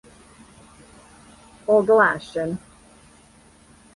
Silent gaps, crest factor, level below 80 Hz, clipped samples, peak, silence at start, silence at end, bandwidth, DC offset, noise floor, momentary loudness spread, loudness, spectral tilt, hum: none; 20 dB; -58 dBFS; under 0.1%; -6 dBFS; 1.7 s; 1.4 s; 11.5 kHz; under 0.1%; -52 dBFS; 17 LU; -20 LUFS; -6 dB/octave; none